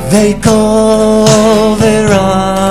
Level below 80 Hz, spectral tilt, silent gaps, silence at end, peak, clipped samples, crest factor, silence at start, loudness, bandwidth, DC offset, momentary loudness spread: -28 dBFS; -5 dB/octave; none; 0 s; 0 dBFS; 1%; 8 dB; 0 s; -8 LUFS; 15 kHz; 3%; 3 LU